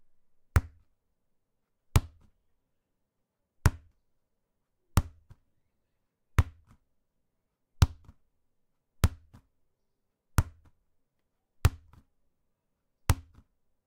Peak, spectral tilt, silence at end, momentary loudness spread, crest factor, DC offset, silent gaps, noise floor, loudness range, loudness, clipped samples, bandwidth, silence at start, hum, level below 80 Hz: 0 dBFS; -5.5 dB/octave; 0.65 s; 4 LU; 34 dB; under 0.1%; none; -82 dBFS; 2 LU; -31 LUFS; under 0.1%; 16 kHz; 0.55 s; none; -40 dBFS